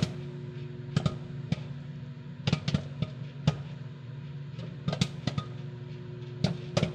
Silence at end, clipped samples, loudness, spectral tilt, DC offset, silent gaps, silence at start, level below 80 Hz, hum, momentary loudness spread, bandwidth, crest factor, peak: 0 s; under 0.1%; -35 LUFS; -6.5 dB/octave; under 0.1%; none; 0 s; -56 dBFS; none; 11 LU; 9.6 kHz; 22 dB; -12 dBFS